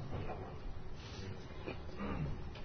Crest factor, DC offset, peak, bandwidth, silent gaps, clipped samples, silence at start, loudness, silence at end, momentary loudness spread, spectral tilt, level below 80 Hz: 14 dB; under 0.1%; -28 dBFS; 6.6 kHz; none; under 0.1%; 0 s; -46 LUFS; 0 s; 8 LU; -6 dB/octave; -48 dBFS